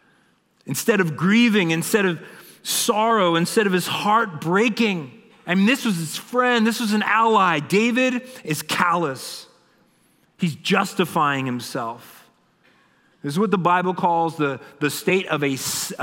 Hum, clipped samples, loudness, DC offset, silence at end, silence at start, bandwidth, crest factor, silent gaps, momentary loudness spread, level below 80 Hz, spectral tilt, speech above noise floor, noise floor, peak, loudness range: none; under 0.1%; -20 LUFS; under 0.1%; 0 s; 0.65 s; 16.5 kHz; 18 dB; none; 11 LU; -70 dBFS; -4.5 dB/octave; 41 dB; -61 dBFS; -2 dBFS; 5 LU